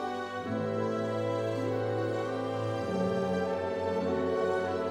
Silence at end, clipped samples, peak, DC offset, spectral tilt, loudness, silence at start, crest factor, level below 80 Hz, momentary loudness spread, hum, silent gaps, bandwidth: 0 s; under 0.1%; -18 dBFS; under 0.1%; -7 dB/octave; -32 LUFS; 0 s; 12 dB; -68 dBFS; 3 LU; none; none; 13.5 kHz